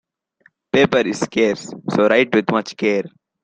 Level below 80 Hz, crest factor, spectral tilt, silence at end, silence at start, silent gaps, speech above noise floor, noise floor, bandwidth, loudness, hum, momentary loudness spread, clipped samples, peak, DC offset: -58 dBFS; 18 dB; -5 dB/octave; 0.35 s; 0.75 s; none; 40 dB; -58 dBFS; 9.4 kHz; -18 LUFS; none; 8 LU; under 0.1%; 0 dBFS; under 0.1%